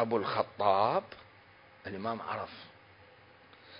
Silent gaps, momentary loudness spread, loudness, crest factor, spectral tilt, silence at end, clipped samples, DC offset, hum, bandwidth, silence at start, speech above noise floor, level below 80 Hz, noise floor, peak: none; 23 LU; -32 LUFS; 22 dB; -3.5 dB/octave; 0 s; under 0.1%; under 0.1%; none; 5.2 kHz; 0 s; 26 dB; -68 dBFS; -58 dBFS; -12 dBFS